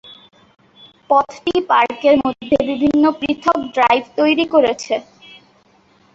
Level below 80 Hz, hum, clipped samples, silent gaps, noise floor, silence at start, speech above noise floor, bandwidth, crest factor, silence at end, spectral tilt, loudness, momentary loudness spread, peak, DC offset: -52 dBFS; none; under 0.1%; none; -54 dBFS; 0.1 s; 38 dB; 7.8 kHz; 16 dB; 1.15 s; -4.5 dB/octave; -16 LUFS; 5 LU; -2 dBFS; under 0.1%